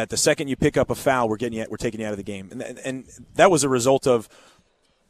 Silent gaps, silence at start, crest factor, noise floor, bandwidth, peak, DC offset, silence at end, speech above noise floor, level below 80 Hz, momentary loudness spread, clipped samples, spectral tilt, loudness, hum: none; 0 s; 20 dB; -63 dBFS; 14 kHz; -2 dBFS; under 0.1%; 0.85 s; 41 dB; -50 dBFS; 15 LU; under 0.1%; -4 dB/octave; -22 LUFS; none